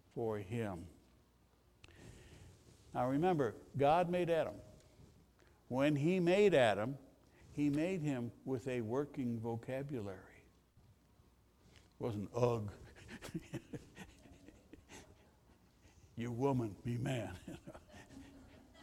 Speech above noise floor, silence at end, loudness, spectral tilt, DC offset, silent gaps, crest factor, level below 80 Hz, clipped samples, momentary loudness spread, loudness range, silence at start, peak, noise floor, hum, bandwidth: 33 dB; 0 s; -37 LUFS; -7 dB/octave; under 0.1%; none; 22 dB; -66 dBFS; under 0.1%; 25 LU; 11 LU; 0.15 s; -18 dBFS; -70 dBFS; none; 16 kHz